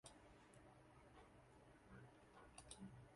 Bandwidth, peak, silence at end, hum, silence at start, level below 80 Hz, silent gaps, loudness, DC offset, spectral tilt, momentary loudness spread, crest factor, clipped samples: 11.5 kHz; -40 dBFS; 0 s; none; 0.05 s; -76 dBFS; none; -65 LUFS; under 0.1%; -4 dB/octave; 9 LU; 24 dB; under 0.1%